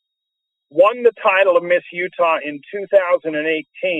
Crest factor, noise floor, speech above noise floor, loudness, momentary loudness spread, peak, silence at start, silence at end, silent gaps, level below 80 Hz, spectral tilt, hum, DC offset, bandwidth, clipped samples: 16 dB; -80 dBFS; 63 dB; -17 LUFS; 11 LU; -2 dBFS; 0.75 s; 0 s; none; -72 dBFS; -6 dB/octave; none; under 0.1%; 4 kHz; under 0.1%